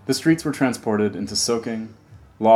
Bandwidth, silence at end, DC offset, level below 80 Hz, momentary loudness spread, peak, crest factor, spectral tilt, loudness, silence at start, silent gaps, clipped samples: 15.5 kHz; 0 s; under 0.1%; -56 dBFS; 10 LU; -2 dBFS; 18 dB; -4.5 dB/octave; -22 LUFS; 0.05 s; none; under 0.1%